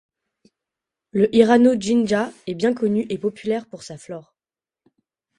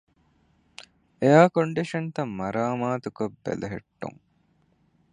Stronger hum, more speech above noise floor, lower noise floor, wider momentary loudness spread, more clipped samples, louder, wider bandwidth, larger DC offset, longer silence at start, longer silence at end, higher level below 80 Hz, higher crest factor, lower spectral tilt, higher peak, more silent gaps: neither; first, over 71 dB vs 42 dB; first, under -90 dBFS vs -66 dBFS; about the same, 22 LU vs 21 LU; neither; first, -19 LUFS vs -25 LUFS; about the same, 11 kHz vs 10.5 kHz; neither; about the same, 1.15 s vs 1.2 s; first, 1.2 s vs 1 s; about the same, -60 dBFS vs -62 dBFS; about the same, 20 dB vs 24 dB; about the same, -6 dB/octave vs -7 dB/octave; about the same, 0 dBFS vs -2 dBFS; neither